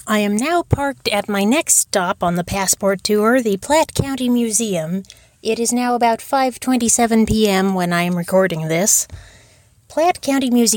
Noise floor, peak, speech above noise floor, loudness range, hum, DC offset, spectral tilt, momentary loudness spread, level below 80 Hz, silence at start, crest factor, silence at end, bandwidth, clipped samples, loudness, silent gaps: -51 dBFS; 0 dBFS; 34 dB; 2 LU; none; under 0.1%; -3.5 dB/octave; 6 LU; -42 dBFS; 0.05 s; 16 dB; 0 s; 17.5 kHz; under 0.1%; -17 LUFS; none